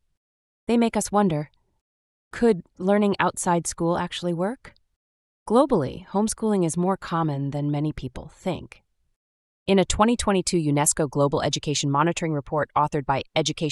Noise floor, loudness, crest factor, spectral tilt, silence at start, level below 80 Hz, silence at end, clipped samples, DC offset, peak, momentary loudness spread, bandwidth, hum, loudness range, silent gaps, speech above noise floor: under -90 dBFS; -23 LUFS; 20 dB; -5 dB/octave; 0.7 s; -46 dBFS; 0 s; under 0.1%; under 0.1%; -4 dBFS; 10 LU; 13.5 kHz; none; 4 LU; 1.81-2.31 s, 4.96-5.46 s, 9.16-9.66 s; over 67 dB